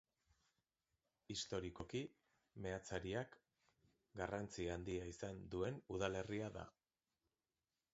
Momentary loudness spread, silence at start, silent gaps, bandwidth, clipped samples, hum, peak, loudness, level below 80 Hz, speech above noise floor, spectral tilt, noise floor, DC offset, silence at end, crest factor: 11 LU; 1.3 s; none; 7.6 kHz; under 0.1%; none; -26 dBFS; -48 LUFS; -66 dBFS; over 43 dB; -4.5 dB/octave; under -90 dBFS; under 0.1%; 1.25 s; 24 dB